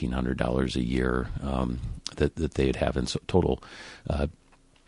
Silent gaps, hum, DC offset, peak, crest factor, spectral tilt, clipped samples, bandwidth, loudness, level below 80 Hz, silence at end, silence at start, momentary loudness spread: none; none; under 0.1%; -8 dBFS; 20 dB; -6.5 dB/octave; under 0.1%; 11.5 kHz; -29 LUFS; -36 dBFS; 0.55 s; 0 s; 8 LU